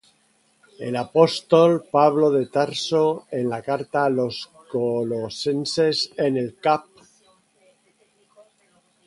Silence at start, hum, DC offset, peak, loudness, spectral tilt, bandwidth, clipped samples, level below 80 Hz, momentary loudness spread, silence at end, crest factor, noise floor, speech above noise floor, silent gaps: 0.8 s; none; under 0.1%; -2 dBFS; -21 LUFS; -5.5 dB/octave; 11.5 kHz; under 0.1%; -66 dBFS; 10 LU; 2.25 s; 20 dB; -63 dBFS; 42 dB; none